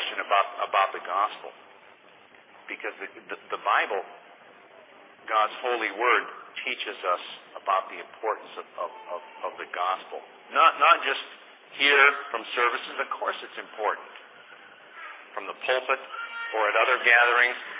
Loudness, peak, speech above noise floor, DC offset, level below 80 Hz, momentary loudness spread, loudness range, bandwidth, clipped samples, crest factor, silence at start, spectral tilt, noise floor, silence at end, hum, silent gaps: -25 LUFS; -6 dBFS; 28 dB; under 0.1%; under -90 dBFS; 21 LU; 10 LU; 4 kHz; under 0.1%; 22 dB; 0 s; 3.5 dB/octave; -54 dBFS; 0 s; none; none